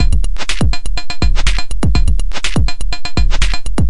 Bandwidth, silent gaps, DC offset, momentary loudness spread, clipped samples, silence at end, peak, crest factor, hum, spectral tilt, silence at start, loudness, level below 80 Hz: 11.5 kHz; none; 30%; 4 LU; under 0.1%; 0 s; 0 dBFS; 12 dB; none; -4.5 dB/octave; 0 s; -18 LUFS; -16 dBFS